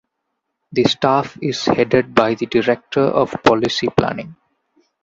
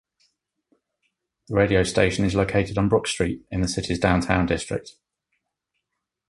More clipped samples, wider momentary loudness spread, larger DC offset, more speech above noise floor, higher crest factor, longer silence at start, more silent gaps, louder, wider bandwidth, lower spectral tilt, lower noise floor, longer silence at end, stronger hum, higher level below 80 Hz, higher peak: neither; about the same, 8 LU vs 7 LU; neither; about the same, 58 dB vs 60 dB; about the same, 18 dB vs 22 dB; second, 0.7 s vs 1.5 s; neither; first, -17 LUFS vs -23 LUFS; second, 7.8 kHz vs 11.5 kHz; about the same, -5.5 dB/octave vs -5.5 dB/octave; second, -75 dBFS vs -82 dBFS; second, 0.7 s vs 1.4 s; neither; second, -50 dBFS vs -40 dBFS; about the same, 0 dBFS vs -2 dBFS